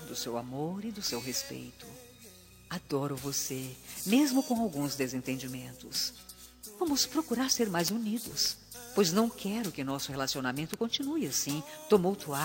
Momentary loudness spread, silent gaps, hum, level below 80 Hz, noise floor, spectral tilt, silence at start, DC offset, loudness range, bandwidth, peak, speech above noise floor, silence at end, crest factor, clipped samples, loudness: 16 LU; none; none; -64 dBFS; -54 dBFS; -3.5 dB/octave; 0 s; under 0.1%; 6 LU; 16.5 kHz; -10 dBFS; 22 dB; 0 s; 22 dB; under 0.1%; -32 LUFS